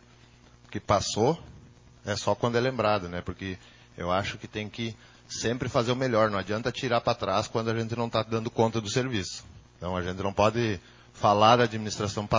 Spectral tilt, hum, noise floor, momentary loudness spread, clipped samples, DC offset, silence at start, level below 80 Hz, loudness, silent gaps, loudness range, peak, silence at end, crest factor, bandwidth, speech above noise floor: -5 dB/octave; none; -55 dBFS; 13 LU; under 0.1%; under 0.1%; 0.7 s; -50 dBFS; -27 LUFS; none; 4 LU; -6 dBFS; 0 s; 22 dB; 7.6 kHz; 28 dB